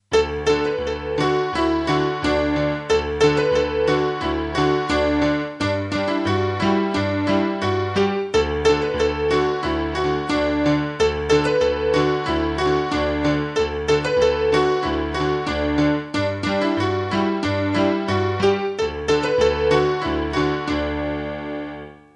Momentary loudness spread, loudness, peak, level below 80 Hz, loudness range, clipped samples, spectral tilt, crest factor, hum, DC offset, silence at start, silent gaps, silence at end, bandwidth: 5 LU; -20 LUFS; -2 dBFS; -38 dBFS; 1 LU; under 0.1%; -6 dB/octave; 18 dB; none; under 0.1%; 0.1 s; none; 0.2 s; 10.5 kHz